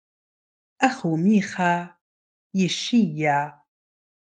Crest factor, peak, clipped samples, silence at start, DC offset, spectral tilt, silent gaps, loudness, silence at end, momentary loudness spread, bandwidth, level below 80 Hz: 20 dB; -4 dBFS; under 0.1%; 0.8 s; under 0.1%; -5.5 dB/octave; 2.01-2.50 s; -22 LUFS; 0.9 s; 8 LU; 9.4 kHz; -72 dBFS